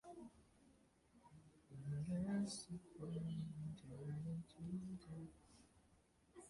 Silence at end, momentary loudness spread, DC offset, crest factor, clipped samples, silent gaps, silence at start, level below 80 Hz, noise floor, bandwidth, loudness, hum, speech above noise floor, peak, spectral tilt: 0 s; 23 LU; under 0.1%; 16 dB; under 0.1%; none; 0.05 s; -72 dBFS; -75 dBFS; 11.5 kHz; -49 LUFS; none; 25 dB; -34 dBFS; -6.5 dB/octave